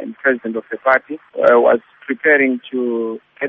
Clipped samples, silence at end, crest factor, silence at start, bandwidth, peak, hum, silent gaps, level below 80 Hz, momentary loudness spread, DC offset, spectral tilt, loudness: under 0.1%; 0 s; 16 dB; 0 s; 5.4 kHz; 0 dBFS; none; none; -66 dBFS; 12 LU; under 0.1%; -3 dB/octave; -16 LUFS